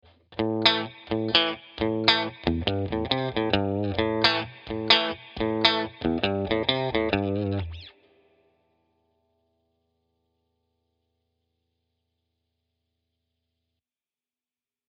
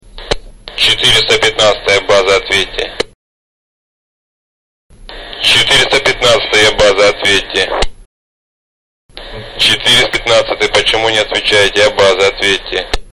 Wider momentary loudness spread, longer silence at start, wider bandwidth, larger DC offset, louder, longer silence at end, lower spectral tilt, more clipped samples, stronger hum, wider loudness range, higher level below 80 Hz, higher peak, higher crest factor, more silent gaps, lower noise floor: second, 10 LU vs 13 LU; first, 0.3 s vs 0.15 s; second, 8.2 kHz vs 14 kHz; second, under 0.1% vs 1%; second, -25 LUFS vs -10 LUFS; first, 7 s vs 0.1 s; first, -6 dB/octave vs -2 dB/octave; neither; neither; first, 8 LU vs 5 LU; second, -50 dBFS vs -32 dBFS; about the same, 0 dBFS vs 0 dBFS; first, 28 dB vs 12 dB; second, none vs 3.15-4.90 s, 8.06-9.09 s; about the same, under -90 dBFS vs under -90 dBFS